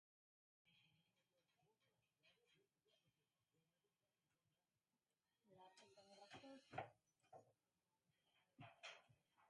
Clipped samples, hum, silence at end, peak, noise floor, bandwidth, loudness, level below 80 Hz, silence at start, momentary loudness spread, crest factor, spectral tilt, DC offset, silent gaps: under 0.1%; none; 0 s; -36 dBFS; under -90 dBFS; 10.5 kHz; -62 LUFS; under -90 dBFS; 0.65 s; 12 LU; 34 dB; -4 dB/octave; under 0.1%; none